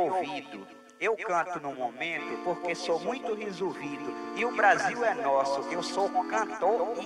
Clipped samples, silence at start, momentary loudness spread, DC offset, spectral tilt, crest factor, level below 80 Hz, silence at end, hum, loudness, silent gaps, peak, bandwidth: under 0.1%; 0 s; 11 LU; under 0.1%; -3.5 dB/octave; 20 dB; -80 dBFS; 0 s; none; -30 LUFS; none; -10 dBFS; 12 kHz